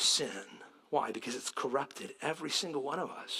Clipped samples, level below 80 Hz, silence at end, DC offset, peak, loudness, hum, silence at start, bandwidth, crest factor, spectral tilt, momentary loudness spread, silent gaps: under 0.1%; -86 dBFS; 0 s; under 0.1%; -16 dBFS; -35 LUFS; none; 0 s; 16 kHz; 20 dB; -1.5 dB/octave; 10 LU; none